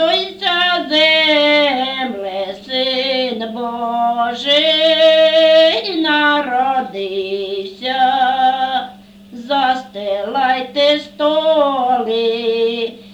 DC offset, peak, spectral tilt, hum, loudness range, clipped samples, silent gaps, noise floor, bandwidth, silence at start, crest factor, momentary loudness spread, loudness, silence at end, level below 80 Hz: under 0.1%; -2 dBFS; -3.5 dB/octave; none; 5 LU; under 0.1%; none; -37 dBFS; 9.2 kHz; 0 s; 14 dB; 12 LU; -15 LUFS; 0 s; -58 dBFS